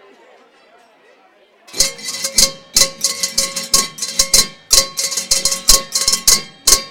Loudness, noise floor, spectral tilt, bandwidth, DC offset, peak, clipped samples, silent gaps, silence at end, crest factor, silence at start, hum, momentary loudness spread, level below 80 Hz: -13 LUFS; -51 dBFS; 1 dB/octave; over 20 kHz; 2%; 0 dBFS; 0.2%; none; 0 s; 18 dB; 0 s; none; 6 LU; -34 dBFS